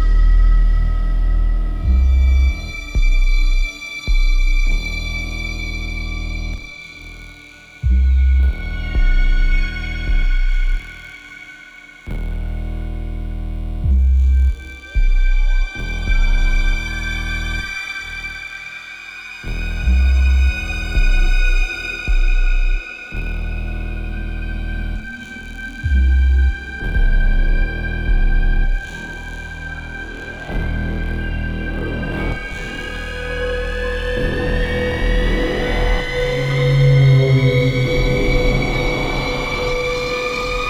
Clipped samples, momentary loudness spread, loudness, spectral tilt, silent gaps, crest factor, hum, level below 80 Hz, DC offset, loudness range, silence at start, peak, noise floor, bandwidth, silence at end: under 0.1%; 14 LU; -20 LUFS; -6 dB/octave; none; 14 dB; none; -18 dBFS; under 0.1%; 9 LU; 0 s; -4 dBFS; -40 dBFS; 7.8 kHz; 0 s